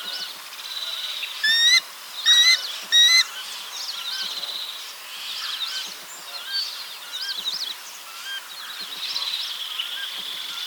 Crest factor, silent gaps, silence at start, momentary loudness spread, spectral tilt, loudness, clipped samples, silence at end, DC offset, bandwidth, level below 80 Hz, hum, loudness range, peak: 20 dB; none; 0 s; 18 LU; 4 dB/octave; -21 LUFS; under 0.1%; 0 s; under 0.1%; over 20 kHz; -88 dBFS; none; 11 LU; -6 dBFS